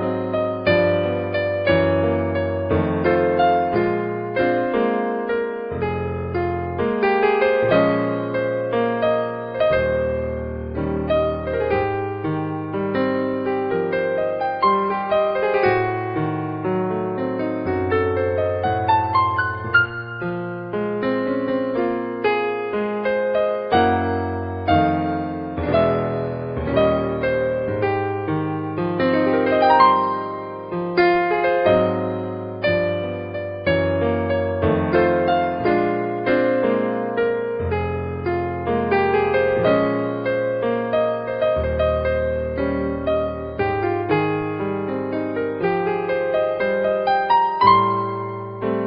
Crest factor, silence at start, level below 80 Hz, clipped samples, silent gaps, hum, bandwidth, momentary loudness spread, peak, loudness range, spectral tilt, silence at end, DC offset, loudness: 18 dB; 0 s; -42 dBFS; under 0.1%; none; none; 5.4 kHz; 8 LU; -2 dBFS; 3 LU; -5 dB/octave; 0 s; under 0.1%; -21 LUFS